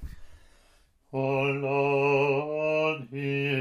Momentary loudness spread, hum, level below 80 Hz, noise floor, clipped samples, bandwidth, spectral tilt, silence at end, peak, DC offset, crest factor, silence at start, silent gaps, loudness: 8 LU; none; -52 dBFS; -62 dBFS; under 0.1%; 7 kHz; -7 dB/octave; 0 s; -14 dBFS; under 0.1%; 14 dB; 0 s; none; -27 LUFS